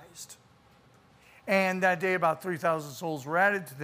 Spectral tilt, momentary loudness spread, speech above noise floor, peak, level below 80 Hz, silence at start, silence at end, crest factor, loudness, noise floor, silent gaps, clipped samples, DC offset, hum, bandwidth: -5 dB/octave; 19 LU; 32 dB; -10 dBFS; -74 dBFS; 0 s; 0 s; 20 dB; -28 LUFS; -60 dBFS; none; under 0.1%; under 0.1%; none; 15.5 kHz